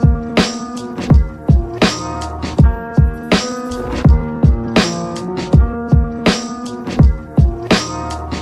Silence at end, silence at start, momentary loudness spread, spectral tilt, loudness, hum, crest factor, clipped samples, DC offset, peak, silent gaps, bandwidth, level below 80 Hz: 0 s; 0 s; 10 LU; -6 dB/octave; -16 LUFS; none; 14 dB; under 0.1%; under 0.1%; 0 dBFS; none; 11 kHz; -18 dBFS